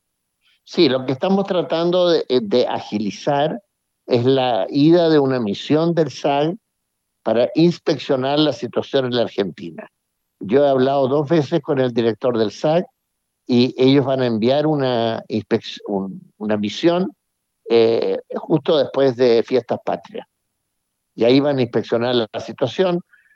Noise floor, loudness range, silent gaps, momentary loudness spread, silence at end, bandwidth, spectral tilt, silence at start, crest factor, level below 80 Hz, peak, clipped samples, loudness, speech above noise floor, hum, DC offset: -75 dBFS; 3 LU; none; 10 LU; 0.35 s; 7.6 kHz; -7 dB/octave; 0.7 s; 16 dB; -72 dBFS; -2 dBFS; under 0.1%; -18 LUFS; 57 dB; none; under 0.1%